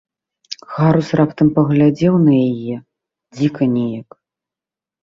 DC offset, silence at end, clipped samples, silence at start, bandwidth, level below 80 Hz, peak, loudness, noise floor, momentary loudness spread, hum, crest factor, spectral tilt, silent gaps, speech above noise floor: under 0.1%; 1 s; under 0.1%; 0.5 s; 7.4 kHz; -54 dBFS; -2 dBFS; -15 LUFS; -88 dBFS; 16 LU; none; 14 dB; -8.5 dB/octave; none; 74 dB